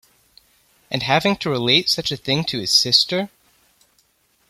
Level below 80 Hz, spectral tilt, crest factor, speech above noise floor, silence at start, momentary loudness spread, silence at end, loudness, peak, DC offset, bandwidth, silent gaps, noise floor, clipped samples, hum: -56 dBFS; -3 dB/octave; 22 dB; 43 dB; 0.9 s; 11 LU; 1.2 s; -18 LUFS; 0 dBFS; under 0.1%; 16 kHz; none; -62 dBFS; under 0.1%; none